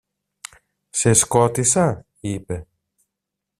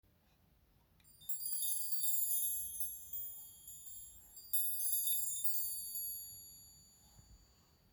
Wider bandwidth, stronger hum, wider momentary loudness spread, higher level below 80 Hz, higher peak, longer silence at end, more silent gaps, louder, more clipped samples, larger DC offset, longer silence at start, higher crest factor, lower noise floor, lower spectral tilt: second, 15.5 kHz vs over 20 kHz; neither; first, 24 LU vs 19 LU; first, -50 dBFS vs -72 dBFS; first, -2 dBFS vs -22 dBFS; first, 0.95 s vs 0.55 s; neither; first, -18 LUFS vs -35 LUFS; neither; neither; second, 0.95 s vs 1.2 s; about the same, 20 dB vs 18 dB; first, -83 dBFS vs -71 dBFS; first, -4.5 dB/octave vs 1 dB/octave